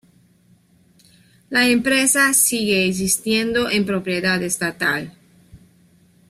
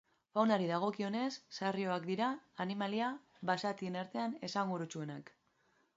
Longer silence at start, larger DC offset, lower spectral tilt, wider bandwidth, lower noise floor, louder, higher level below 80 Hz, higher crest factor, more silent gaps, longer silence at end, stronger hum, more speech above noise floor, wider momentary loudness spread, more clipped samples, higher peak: first, 1.5 s vs 0.35 s; neither; second, -2.5 dB/octave vs -4.5 dB/octave; first, 16 kHz vs 7.6 kHz; second, -56 dBFS vs -75 dBFS; first, -18 LUFS vs -38 LUFS; first, -54 dBFS vs -84 dBFS; about the same, 20 dB vs 20 dB; neither; about the same, 0.75 s vs 0.7 s; neither; about the same, 37 dB vs 38 dB; about the same, 8 LU vs 9 LU; neither; first, -2 dBFS vs -18 dBFS